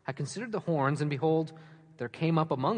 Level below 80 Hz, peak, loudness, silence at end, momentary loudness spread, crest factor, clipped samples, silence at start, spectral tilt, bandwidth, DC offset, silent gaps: -74 dBFS; -14 dBFS; -31 LUFS; 0 s; 11 LU; 16 dB; under 0.1%; 0.05 s; -7 dB/octave; 10 kHz; under 0.1%; none